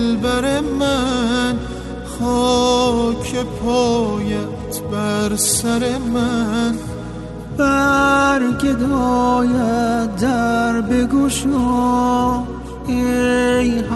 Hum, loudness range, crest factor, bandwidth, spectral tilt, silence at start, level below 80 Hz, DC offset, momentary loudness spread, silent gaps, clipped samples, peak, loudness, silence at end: none; 3 LU; 14 dB; 12.5 kHz; -4.5 dB/octave; 0 s; -34 dBFS; under 0.1%; 10 LU; none; under 0.1%; -4 dBFS; -17 LUFS; 0 s